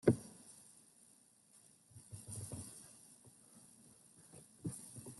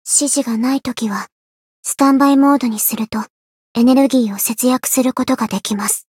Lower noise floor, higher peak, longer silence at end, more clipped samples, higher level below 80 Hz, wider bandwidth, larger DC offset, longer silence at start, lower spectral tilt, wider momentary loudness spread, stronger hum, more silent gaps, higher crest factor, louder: second, -68 dBFS vs under -90 dBFS; second, -14 dBFS vs 0 dBFS; second, 0 s vs 0.15 s; neither; second, -72 dBFS vs -60 dBFS; second, 12 kHz vs 17 kHz; neither; about the same, 0.05 s vs 0.05 s; first, -6.5 dB/octave vs -3.5 dB/octave; first, 16 LU vs 13 LU; neither; second, none vs 1.32-1.83 s, 3.30-3.75 s; first, 32 dB vs 16 dB; second, -47 LUFS vs -15 LUFS